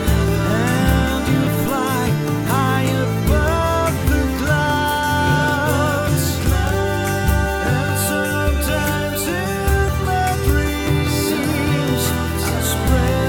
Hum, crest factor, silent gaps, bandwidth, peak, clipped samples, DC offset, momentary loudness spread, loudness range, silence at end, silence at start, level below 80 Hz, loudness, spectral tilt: none; 14 dB; none; over 20 kHz; -4 dBFS; under 0.1%; under 0.1%; 3 LU; 1 LU; 0 s; 0 s; -26 dBFS; -18 LUFS; -5 dB/octave